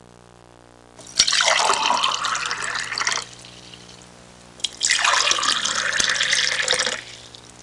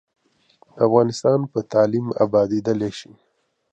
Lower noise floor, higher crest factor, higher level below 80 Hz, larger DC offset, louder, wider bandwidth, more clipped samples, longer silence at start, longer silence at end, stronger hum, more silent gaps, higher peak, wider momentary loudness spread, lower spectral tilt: second, -48 dBFS vs -58 dBFS; about the same, 22 dB vs 18 dB; about the same, -58 dBFS vs -60 dBFS; neither; about the same, -19 LUFS vs -20 LUFS; first, 11.5 kHz vs 8.8 kHz; neither; first, 0.95 s vs 0.75 s; second, 0.15 s vs 0.7 s; first, 60 Hz at -50 dBFS vs none; neither; about the same, 0 dBFS vs -2 dBFS; first, 21 LU vs 7 LU; second, 1 dB/octave vs -7 dB/octave